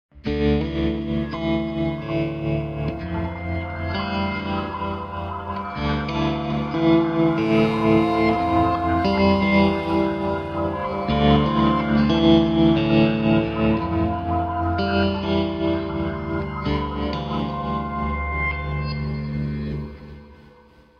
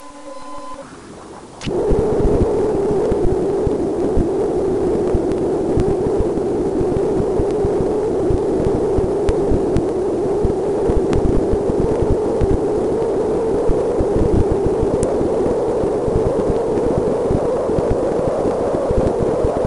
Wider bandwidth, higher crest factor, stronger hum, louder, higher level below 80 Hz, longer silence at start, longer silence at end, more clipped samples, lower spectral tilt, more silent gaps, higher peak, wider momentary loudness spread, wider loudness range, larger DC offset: second, 6.6 kHz vs 11 kHz; about the same, 18 dB vs 16 dB; neither; second, -22 LUFS vs -18 LUFS; second, -36 dBFS vs -26 dBFS; first, 0.15 s vs 0 s; first, 0.6 s vs 0 s; neither; about the same, -8.5 dB/octave vs -8 dB/octave; neither; about the same, -2 dBFS vs -2 dBFS; first, 10 LU vs 2 LU; first, 8 LU vs 1 LU; neither